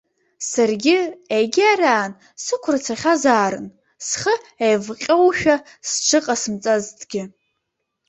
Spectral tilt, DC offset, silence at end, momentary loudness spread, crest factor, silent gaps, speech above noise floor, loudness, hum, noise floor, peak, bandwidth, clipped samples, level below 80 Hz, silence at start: -3 dB/octave; under 0.1%; 0.8 s; 13 LU; 18 dB; none; 58 dB; -19 LUFS; none; -76 dBFS; -2 dBFS; 8.4 kHz; under 0.1%; -60 dBFS; 0.4 s